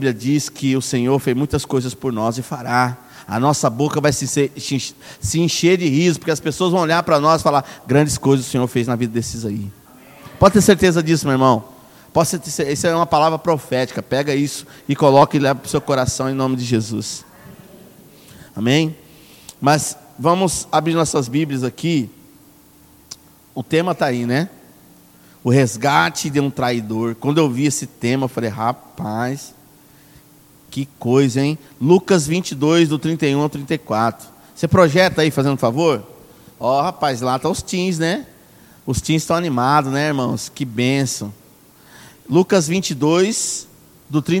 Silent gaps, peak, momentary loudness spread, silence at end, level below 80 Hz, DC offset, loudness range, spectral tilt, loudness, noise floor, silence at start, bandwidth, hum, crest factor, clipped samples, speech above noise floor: none; 0 dBFS; 10 LU; 0 s; -48 dBFS; under 0.1%; 5 LU; -5 dB/octave; -18 LUFS; -48 dBFS; 0 s; 17.5 kHz; none; 18 dB; under 0.1%; 31 dB